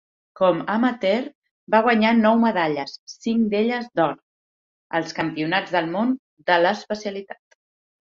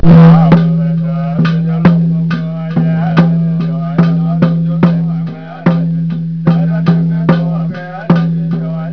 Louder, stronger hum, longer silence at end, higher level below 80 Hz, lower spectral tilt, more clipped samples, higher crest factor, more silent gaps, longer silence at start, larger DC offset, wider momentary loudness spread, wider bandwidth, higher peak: second, -21 LUFS vs -12 LUFS; neither; first, 0.65 s vs 0 s; second, -66 dBFS vs -34 dBFS; second, -6 dB/octave vs -10.5 dB/octave; second, under 0.1% vs 0.9%; first, 20 dB vs 10 dB; first, 1.35-1.42 s, 1.51-1.67 s, 2.98-3.07 s, 4.22-4.90 s, 6.19-6.37 s vs none; first, 0.4 s vs 0 s; neither; first, 13 LU vs 8 LU; first, 7.4 kHz vs 5.4 kHz; about the same, -2 dBFS vs 0 dBFS